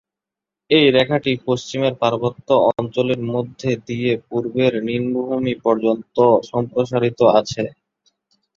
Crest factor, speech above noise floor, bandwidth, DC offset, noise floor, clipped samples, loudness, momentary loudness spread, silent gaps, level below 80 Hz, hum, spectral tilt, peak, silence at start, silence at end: 18 dB; 69 dB; 7.6 kHz; under 0.1%; -87 dBFS; under 0.1%; -19 LUFS; 9 LU; none; -56 dBFS; none; -6 dB/octave; -2 dBFS; 0.7 s; 0.85 s